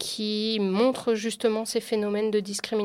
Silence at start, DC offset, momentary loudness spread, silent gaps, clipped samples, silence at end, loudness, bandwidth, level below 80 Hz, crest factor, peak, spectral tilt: 0 s; under 0.1%; 4 LU; none; under 0.1%; 0 s; -26 LUFS; 16 kHz; -70 dBFS; 16 dB; -10 dBFS; -4 dB/octave